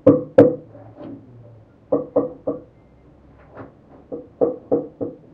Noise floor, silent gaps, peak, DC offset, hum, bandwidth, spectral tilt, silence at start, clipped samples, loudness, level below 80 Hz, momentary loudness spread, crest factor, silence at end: -50 dBFS; none; 0 dBFS; under 0.1%; none; 4.7 kHz; -10.5 dB/octave; 0.05 s; under 0.1%; -20 LUFS; -54 dBFS; 27 LU; 22 dB; 0.2 s